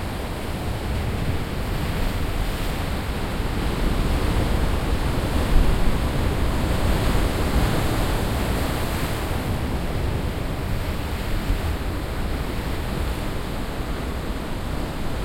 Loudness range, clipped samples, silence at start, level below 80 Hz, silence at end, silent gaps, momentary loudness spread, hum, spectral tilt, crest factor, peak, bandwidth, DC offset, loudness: 5 LU; under 0.1%; 0 s; -26 dBFS; 0 s; none; 6 LU; none; -5.5 dB/octave; 20 dB; -4 dBFS; 16.5 kHz; under 0.1%; -26 LUFS